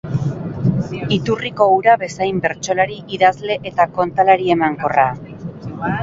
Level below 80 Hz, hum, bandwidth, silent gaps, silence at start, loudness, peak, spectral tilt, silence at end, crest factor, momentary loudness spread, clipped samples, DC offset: -48 dBFS; none; 7.8 kHz; none; 0.05 s; -17 LUFS; 0 dBFS; -6 dB/octave; 0 s; 16 dB; 10 LU; under 0.1%; under 0.1%